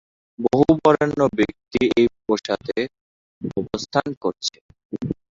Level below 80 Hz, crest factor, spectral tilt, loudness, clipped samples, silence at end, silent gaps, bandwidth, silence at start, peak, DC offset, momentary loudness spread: -50 dBFS; 20 dB; -6 dB/octave; -21 LUFS; under 0.1%; 0.2 s; 3.01-3.41 s, 4.17-4.21 s, 4.61-4.69 s, 4.85-4.90 s; 7.8 kHz; 0.4 s; -2 dBFS; under 0.1%; 13 LU